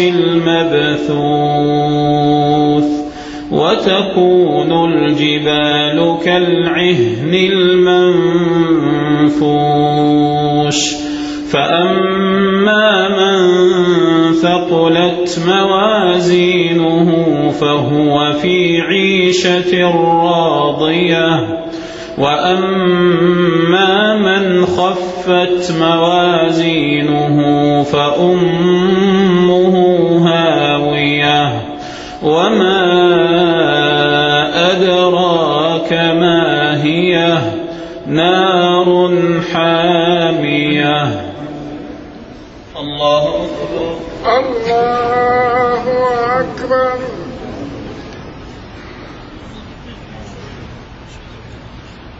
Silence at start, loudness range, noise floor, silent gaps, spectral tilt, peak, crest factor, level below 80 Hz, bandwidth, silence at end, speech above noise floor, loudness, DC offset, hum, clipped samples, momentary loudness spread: 0 s; 6 LU; -33 dBFS; none; -5.5 dB/octave; 0 dBFS; 12 dB; -42 dBFS; 8 kHz; 0 s; 22 dB; -12 LUFS; under 0.1%; none; under 0.1%; 15 LU